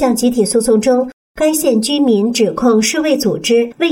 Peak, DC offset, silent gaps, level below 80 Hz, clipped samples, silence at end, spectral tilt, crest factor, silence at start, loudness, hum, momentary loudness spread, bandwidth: -2 dBFS; under 0.1%; 1.13-1.35 s; -48 dBFS; under 0.1%; 0 s; -4 dB/octave; 10 dB; 0 s; -13 LUFS; none; 3 LU; 17 kHz